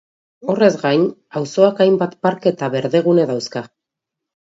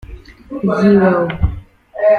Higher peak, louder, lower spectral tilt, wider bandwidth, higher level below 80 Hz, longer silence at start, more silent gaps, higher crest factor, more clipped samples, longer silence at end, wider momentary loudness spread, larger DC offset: about the same, 0 dBFS vs -2 dBFS; second, -17 LUFS vs -14 LUFS; second, -6.5 dB/octave vs -9 dB/octave; first, 7.8 kHz vs 6.6 kHz; second, -66 dBFS vs -28 dBFS; first, 0.45 s vs 0.05 s; neither; about the same, 18 dB vs 14 dB; neither; first, 0.75 s vs 0 s; second, 11 LU vs 21 LU; neither